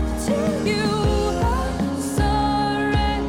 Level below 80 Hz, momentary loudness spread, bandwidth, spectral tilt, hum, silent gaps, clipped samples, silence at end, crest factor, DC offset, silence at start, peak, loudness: -28 dBFS; 3 LU; 16 kHz; -5.5 dB/octave; none; none; under 0.1%; 0 s; 12 dB; under 0.1%; 0 s; -8 dBFS; -21 LUFS